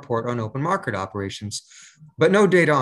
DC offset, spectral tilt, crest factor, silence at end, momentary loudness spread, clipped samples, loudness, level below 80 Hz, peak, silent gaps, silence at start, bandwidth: under 0.1%; -5.5 dB/octave; 18 dB; 0 s; 15 LU; under 0.1%; -21 LUFS; -64 dBFS; -4 dBFS; none; 0 s; 12.5 kHz